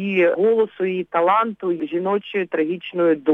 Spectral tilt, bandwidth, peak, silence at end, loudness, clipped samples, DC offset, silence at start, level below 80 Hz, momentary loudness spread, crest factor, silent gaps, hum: -8.5 dB/octave; 4 kHz; -4 dBFS; 0 s; -20 LUFS; under 0.1%; under 0.1%; 0 s; -70 dBFS; 7 LU; 14 dB; none; none